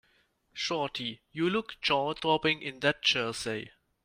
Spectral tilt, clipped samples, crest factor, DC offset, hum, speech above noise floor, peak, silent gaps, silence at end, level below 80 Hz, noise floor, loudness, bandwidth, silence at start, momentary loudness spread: -3.5 dB/octave; under 0.1%; 20 dB; under 0.1%; none; 39 dB; -10 dBFS; none; 0.35 s; -66 dBFS; -70 dBFS; -30 LUFS; 15.5 kHz; 0.55 s; 10 LU